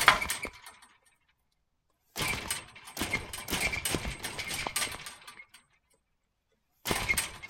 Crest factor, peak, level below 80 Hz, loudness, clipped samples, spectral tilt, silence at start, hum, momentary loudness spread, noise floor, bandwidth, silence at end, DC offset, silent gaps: 32 dB; -2 dBFS; -52 dBFS; -32 LUFS; under 0.1%; -1.5 dB/octave; 0 s; none; 16 LU; -78 dBFS; 17 kHz; 0 s; under 0.1%; none